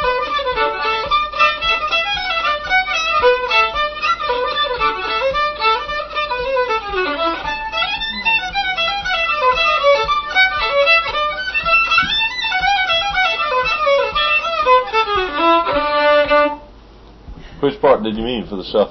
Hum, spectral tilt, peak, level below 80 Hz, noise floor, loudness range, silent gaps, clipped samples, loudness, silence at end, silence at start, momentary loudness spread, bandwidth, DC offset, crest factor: none; -3.5 dB/octave; 0 dBFS; -40 dBFS; -41 dBFS; 4 LU; none; under 0.1%; -16 LUFS; 0 s; 0 s; 6 LU; 6.4 kHz; under 0.1%; 16 dB